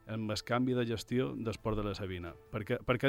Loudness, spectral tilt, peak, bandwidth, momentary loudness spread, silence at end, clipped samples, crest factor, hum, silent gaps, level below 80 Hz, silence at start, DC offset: -36 LUFS; -6 dB/octave; -16 dBFS; 16.5 kHz; 9 LU; 0 s; under 0.1%; 20 dB; none; none; -52 dBFS; 0.05 s; under 0.1%